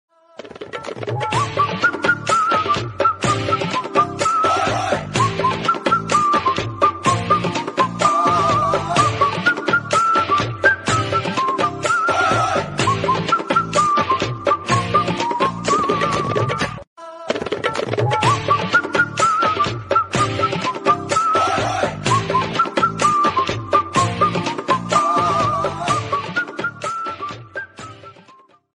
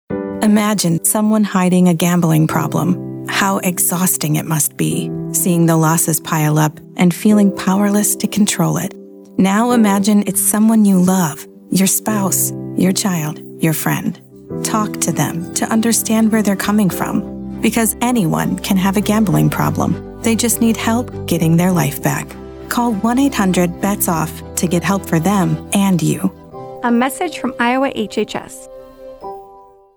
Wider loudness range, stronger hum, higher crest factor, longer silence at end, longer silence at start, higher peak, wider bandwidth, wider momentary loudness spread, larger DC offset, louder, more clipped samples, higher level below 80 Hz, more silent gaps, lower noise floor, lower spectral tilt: about the same, 3 LU vs 4 LU; neither; about the same, 18 dB vs 14 dB; about the same, 0.45 s vs 0.35 s; first, 0.4 s vs 0.1 s; about the same, -2 dBFS vs 0 dBFS; second, 11.5 kHz vs over 20 kHz; about the same, 8 LU vs 9 LU; neither; second, -18 LUFS vs -15 LUFS; neither; about the same, -48 dBFS vs -44 dBFS; first, 16.87-16.96 s vs none; first, -50 dBFS vs -43 dBFS; about the same, -4.5 dB/octave vs -5 dB/octave